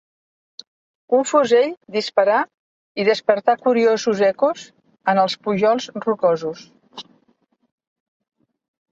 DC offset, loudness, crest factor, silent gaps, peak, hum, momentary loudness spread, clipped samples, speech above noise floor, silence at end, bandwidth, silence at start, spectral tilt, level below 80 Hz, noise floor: under 0.1%; -19 LUFS; 18 dB; 2.54-2.95 s; -2 dBFS; none; 16 LU; under 0.1%; 45 dB; 1.9 s; 7.8 kHz; 1.1 s; -4.5 dB/octave; -68 dBFS; -64 dBFS